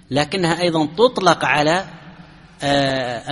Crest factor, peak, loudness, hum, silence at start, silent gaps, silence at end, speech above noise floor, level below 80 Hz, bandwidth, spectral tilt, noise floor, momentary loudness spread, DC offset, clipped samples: 18 dB; 0 dBFS; -18 LUFS; none; 0.1 s; none; 0 s; 25 dB; -50 dBFS; 11.5 kHz; -4.5 dB/octave; -43 dBFS; 7 LU; under 0.1%; under 0.1%